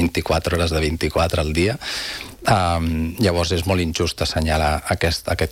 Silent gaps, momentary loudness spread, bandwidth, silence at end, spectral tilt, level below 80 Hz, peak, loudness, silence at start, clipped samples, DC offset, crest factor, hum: none; 5 LU; 16.5 kHz; 0 s; -5 dB/octave; -34 dBFS; -4 dBFS; -20 LUFS; 0 s; under 0.1%; under 0.1%; 16 dB; none